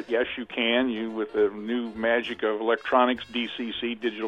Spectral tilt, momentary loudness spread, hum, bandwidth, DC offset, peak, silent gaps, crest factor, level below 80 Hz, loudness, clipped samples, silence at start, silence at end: -5.5 dB/octave; 8 LU; none; 7.4 kHz; under 0.1%; -6 dBFS; none; 20 dB; -62 dBFS; -26 LUFS; under 0.1%; 0 s; 0 s